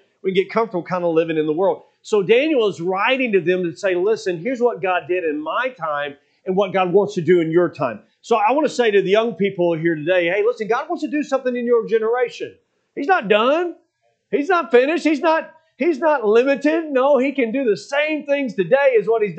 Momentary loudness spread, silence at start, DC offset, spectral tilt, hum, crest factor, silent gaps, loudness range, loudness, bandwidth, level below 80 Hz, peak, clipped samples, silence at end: 8 LU; 0.25 s; under 0.1%; -6 dB/octave; none; 18 dB; none; 3 LU; -19 LUFS; 8.6 kHz; -78 dBFS; 0 dBFS; under 0.1%; 0 s